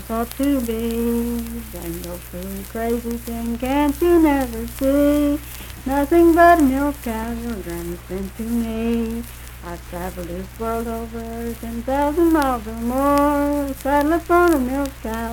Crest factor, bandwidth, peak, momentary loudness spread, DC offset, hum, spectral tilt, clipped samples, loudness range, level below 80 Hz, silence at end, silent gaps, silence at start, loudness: 18 dB; 19 kHz; -2 dBFS; 15 LU; under 0.1%; none; -6 dB/octave; under 0.1%; 9 LU; -34 dBFS; 0 s; none; 0 s; -20 LUFS